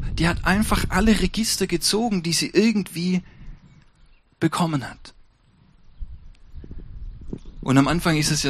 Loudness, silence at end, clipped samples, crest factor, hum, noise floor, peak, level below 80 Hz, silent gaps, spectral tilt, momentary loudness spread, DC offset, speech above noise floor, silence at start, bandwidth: -21 LUFS; 0 s; under 0.1%; 20 dB; none; -56 dBFS; -2 dBFS; -34 dBFS; none; -4.5 dB/octave; 22 LU; under 0.1%; 35 dB; 0 s; 15 kHz